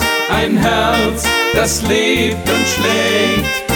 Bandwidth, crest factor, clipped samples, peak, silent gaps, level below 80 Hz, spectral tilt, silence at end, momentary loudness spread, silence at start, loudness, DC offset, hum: over 20 kHz; 12 dB; under 0.1%; -2 dBFS; none; -32 dBFS; -3.5 dB/octave; 0 s; 2 LU; 0 s; -13 LUFS; under 0.1%; none